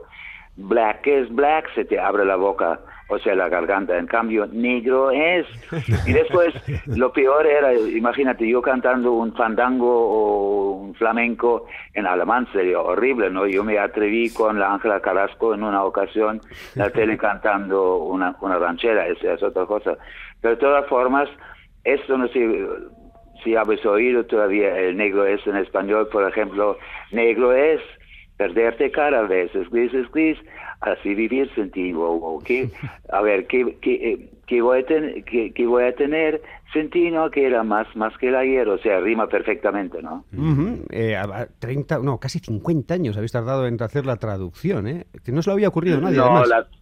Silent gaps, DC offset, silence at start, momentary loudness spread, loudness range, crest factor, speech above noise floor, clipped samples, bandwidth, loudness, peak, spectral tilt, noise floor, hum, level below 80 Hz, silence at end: none; under 0.1%; 0 s; 9 LU; 4 LU; 20 dB; 21 dB; under 0.1%; 9.6 kHz; -20 LUFS; 0 dBFS; -7.5 dB/octave; -40 dBFS; none; -48 dBFS; 0.2 s